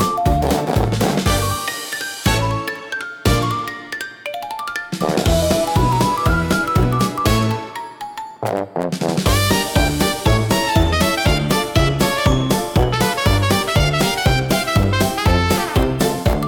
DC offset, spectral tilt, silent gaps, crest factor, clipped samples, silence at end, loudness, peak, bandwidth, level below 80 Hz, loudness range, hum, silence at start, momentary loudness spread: under 0.1%; -5 dB/octave; none; 16 dB; under 0.1%; 0 s; -18 LUFS; -2 dBFS; 18 kHz; -26 dBFS; 4 LU; none; 0 s; 9 LU